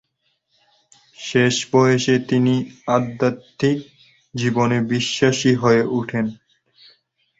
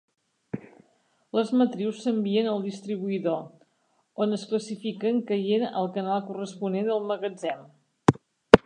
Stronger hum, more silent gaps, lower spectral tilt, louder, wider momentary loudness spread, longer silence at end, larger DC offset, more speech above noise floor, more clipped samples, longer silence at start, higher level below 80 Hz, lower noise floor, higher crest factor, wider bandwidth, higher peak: neither; neither; about the same, -5.5 dB/octave vs -6.5 dB/octave; first, -19 LUFS vs -27 LUFS; second, 8 LU vs 13 LU; first, 1.05 s vs 0.1 s; neither; first, 51 dB vs 43 dB; neither; first, 1.2 s vs 0.55 s; about the same, -56 dBFS vs -52 dBFS; about the same, -70 dBFS vs -70 dBFS; second, 18 dB vs 26 dB; second, 8 kHz vs 10.5 kHz; about the same, -2 dBFS vs 0 dBFS